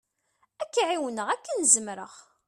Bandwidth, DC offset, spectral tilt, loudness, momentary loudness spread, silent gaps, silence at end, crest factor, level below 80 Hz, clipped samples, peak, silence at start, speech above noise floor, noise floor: 14 kHz; under 0.1%; -0.5 dB/octave; -25 LUFS; 19 LU; none; 0.25 s; 22 dB; -78 dBFS; under 0.1%; -6 dBFS; 0.6 s; 45 dB; -71 dBFS